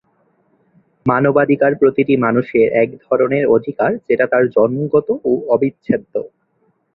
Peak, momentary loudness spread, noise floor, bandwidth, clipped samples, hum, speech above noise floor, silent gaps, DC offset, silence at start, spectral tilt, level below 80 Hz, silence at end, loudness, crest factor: -2 dBFS; 6 LU; -62 dBFS; 4.1 kHz; under 0.1%; none; 47 dB; none; under 0.1%; 1.05 s; -11 dB/octave; -56 dBFS; 0.65 s; -16 LUFS; 14 dB